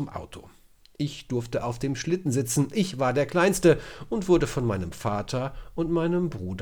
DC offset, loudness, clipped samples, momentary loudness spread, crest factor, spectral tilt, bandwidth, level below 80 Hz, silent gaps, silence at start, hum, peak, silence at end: under 0.1%; -26 LUFS; under 0.1%; 11 LU; 18 dB; -5.5 dB/octave; over 20 kHz; -46 dBFS; none; 0 s; none; -8 dBFS; 0 s